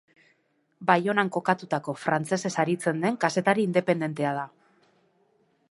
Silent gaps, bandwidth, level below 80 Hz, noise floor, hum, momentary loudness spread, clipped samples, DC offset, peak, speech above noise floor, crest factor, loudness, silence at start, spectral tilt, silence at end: none; 11.5 kHz; -76 dBFS; -70 dBFS; none; 7 LU; under 0.1%; under 0.1%; -4 dBFS; 44 dB; 24 dB; -26 LUFS; 0.8 s; -5.5 dB/octave; 1.25 s